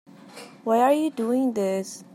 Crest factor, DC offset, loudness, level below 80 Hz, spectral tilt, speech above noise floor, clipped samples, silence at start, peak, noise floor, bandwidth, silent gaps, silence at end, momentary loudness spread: 16 dB; under 0.1%; -24 LUFS; -80 dBFS; -5.5 dB/octave; 22 dB; under 0.1%; 0.25 s; -8 dBFS; -45 dBFS; 15.5 kHz; none; 0.1 s; 18 LU